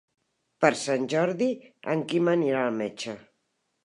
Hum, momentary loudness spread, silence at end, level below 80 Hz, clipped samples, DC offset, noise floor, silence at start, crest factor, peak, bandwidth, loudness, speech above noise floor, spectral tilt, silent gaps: none; 12 LU; 0.65 s; -78 dBFS; under 0.1%; under 0.1%; -76 dBFS; 0.6 s; 22 dB; -4 dBFS; 11 kHz; -26 LUFS; 50 dB; -5 dB/octave; none